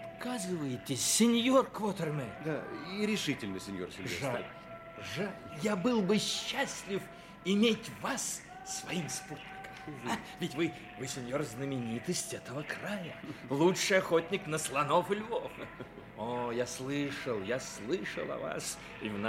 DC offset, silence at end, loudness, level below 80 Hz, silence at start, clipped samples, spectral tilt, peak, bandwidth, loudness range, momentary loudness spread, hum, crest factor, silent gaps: under 0.1%; 0 s; -34 LUFS; -66 dBFS; 0 s; under 0.1%; -4 dB/octave; -14 dBFS; 16.5 kHz; 6 LU; 14 LU; none; 20 dB; none